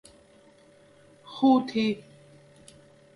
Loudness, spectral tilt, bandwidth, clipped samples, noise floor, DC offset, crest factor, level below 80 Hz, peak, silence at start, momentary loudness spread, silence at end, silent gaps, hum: -25 LUFS; -6 dB/octave; 11.5 kHz; under 0.1%; -57 dBFS; under 0.1%; 20 dB; -72 dBFS; -10 dBFS; 1.3 s; 16 LU; 1.15 s; none; none